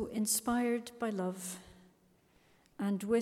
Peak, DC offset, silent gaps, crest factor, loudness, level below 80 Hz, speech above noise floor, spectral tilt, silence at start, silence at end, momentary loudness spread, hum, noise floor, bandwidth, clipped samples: -20 dBFS; under 0.1%; none; 16 dB; -35 LUFS; -68 dBFS; 34 dB; -4 dB/octave; 0 s; 0 s; 12 LU; none; -68 dBFS; 16.5 kHz; under 0.1%